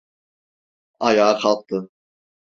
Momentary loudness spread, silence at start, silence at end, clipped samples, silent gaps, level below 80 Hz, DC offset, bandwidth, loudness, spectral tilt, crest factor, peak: 12 LU; 1 s; 0.55 s; under 0.1%; none; -64 dBFS; under 0.1%; 7.8 kHz; -19 LUFS; -4.5 dB/octave; 20 dB; -2 dBFS